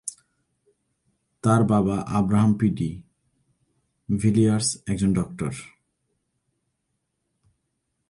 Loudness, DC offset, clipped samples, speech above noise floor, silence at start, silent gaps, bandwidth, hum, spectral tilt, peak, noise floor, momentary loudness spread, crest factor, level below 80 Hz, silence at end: -23 LUFS; under 0.1%; under 0.1%; 56 dB; 0.05 s; none; 11.5 kHz; none; -6.5 dB/octave; -4 dBFS; -77 dBFS; 12 LU; 20 dB; -50 dBFS; 2.45 s